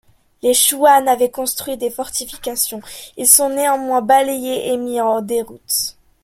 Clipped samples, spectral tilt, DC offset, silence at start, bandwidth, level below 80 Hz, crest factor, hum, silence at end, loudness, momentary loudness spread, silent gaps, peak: under 0.1%; -1 dB/octave; under 0.1%; 0.45 s; 16.5 kHz; -54 dBFS; 18 dB; none; 0.35 s; -16 LUFS; 12 LU; none; 0 dBFS